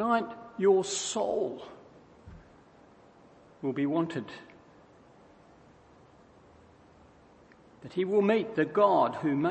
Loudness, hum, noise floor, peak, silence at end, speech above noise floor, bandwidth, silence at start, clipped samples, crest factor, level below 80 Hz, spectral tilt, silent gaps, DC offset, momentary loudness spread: -29 LUFS; none; -58 dBFS; -12 dBFS; 0 s; 30 dB; 8.8 kHz; 0 s; under 0.1%; 20 dB; -68 dBFS; -5 dB/octave; none; under 0.1%; 18 LU